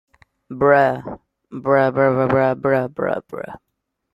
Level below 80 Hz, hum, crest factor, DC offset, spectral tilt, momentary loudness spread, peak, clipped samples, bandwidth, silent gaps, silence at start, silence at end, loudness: -56 dBFS; none; 16 dB; under 0.1%; -9 dB/octave; 20 LU; -2 dBFS; under 0.1%; 5.6 kHz; none; 0.5 s; 0.55 s; -18 LUFS